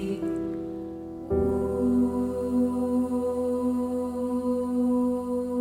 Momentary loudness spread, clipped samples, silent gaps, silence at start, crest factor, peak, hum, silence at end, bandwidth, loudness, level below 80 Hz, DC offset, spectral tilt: 8 LU; under 0.1%; none; 0 s; 12 dB; -14 dBFS; none; 0 s; 13.5 kHz; -27 LUFS; -48 dBFS; under 0.1%; -8.5 dB/octave